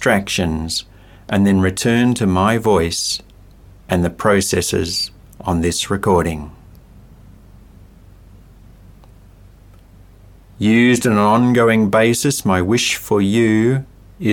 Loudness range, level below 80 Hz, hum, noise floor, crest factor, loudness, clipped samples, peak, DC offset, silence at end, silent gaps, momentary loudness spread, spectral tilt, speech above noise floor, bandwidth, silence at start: 8 LU; -40 dBFS; none; -44 dBFS; 18 dB; -16 LUFS; under 0.1%; 0 dBFS; under 0.1%; 0 s; none; 9 LU; -5 dB/octave; 28 dB; 17.5 kHz; 0 s